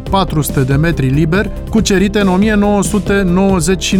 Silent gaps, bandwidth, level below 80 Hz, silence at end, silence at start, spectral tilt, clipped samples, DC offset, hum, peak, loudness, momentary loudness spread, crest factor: none; 17 kHz; -24 dBFS; 0 s; 0 s; -5.5 dB/octave; under 0.1%; under 0.1%; none; -2 dBFS; -13 LUFS; 3 LU; 10 dB